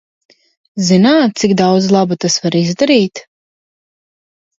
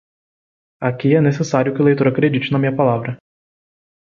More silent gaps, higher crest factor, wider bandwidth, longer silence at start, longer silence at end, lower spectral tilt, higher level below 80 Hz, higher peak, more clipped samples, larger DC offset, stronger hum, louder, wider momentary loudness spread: neither; about the same, 14 dB vs 16 dB; about the same, 7.8 kHz vs 7.4 kHz; about the same, 0.75 s vs 0.8 s; first, 1.4 s vs 0.9 s; second, -5 dB/octave vs -7.5 dB/octave; about the same, -56 dBFS vs -58 dBFS; about the same, 0 dBFS vs -2 dBFS; neither; neither; neither; first, -12 LUFS vs -17 LUFS; about the same, 9 LU vs 9 LU